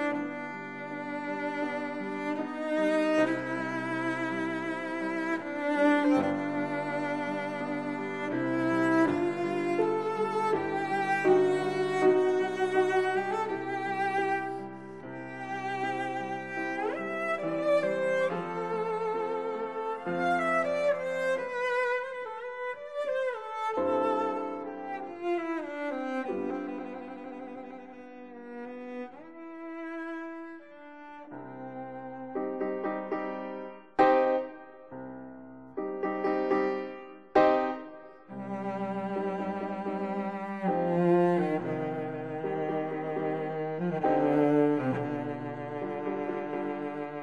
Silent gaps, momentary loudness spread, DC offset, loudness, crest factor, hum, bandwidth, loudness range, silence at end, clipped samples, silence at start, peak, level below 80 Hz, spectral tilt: none; 17 LU; 0.1%; -30 LUFS; 22 dB; none; 11.5 kHz; 10 LU; 0 s; under 0.1%; 0 s; -8 dBFS; -70 dBFS; -7 dB/octave